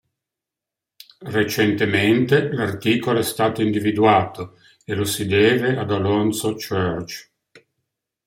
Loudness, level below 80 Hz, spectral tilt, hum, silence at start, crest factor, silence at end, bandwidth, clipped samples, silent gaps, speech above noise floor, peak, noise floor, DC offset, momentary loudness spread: -20 LUFS; -58 dBFS; -5.5 dB/octave; none; 1.2 s; 18 dB; 0.7 s; 16.5 kHz; under 0.1%; none; 67 dB; -2 dBFS; -86 dBFS; under 0.1%; 13 LU